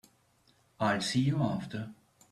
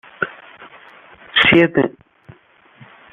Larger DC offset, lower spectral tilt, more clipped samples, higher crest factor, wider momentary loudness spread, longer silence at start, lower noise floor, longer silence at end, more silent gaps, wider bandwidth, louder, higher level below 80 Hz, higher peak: neither; about the same, -5.5 dB/octave vs -6.5 dB/octave; neither; about the same, 18 dB vs 20 dB; about the same, 13 LU vs 15 LU; first, 0.8 s vs 0.2 s; first, -68 dBFS vs -50 dBFS; second, 0.4 s vs 1.25 s; neither; first, 13 kHz vs 6.4 kHz; second, -31 LUFS vs -15 LUFS; second, -66 dBFS vs -52 dBFS; second, -16 dBFS vs 0 dBFS